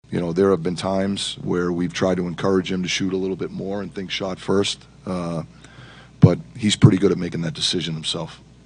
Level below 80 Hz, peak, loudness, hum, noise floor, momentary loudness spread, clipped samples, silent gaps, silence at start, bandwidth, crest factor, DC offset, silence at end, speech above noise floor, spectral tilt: -50 dBFS; 0 dBFS; -21 LUFS; none; -44 dBFS; 12 LU; under 0.1%; none; 0.1 s; 10 kHz; 22 dB; under 0.1%; 0.3 s; 23 dB; -5.5 dB/octave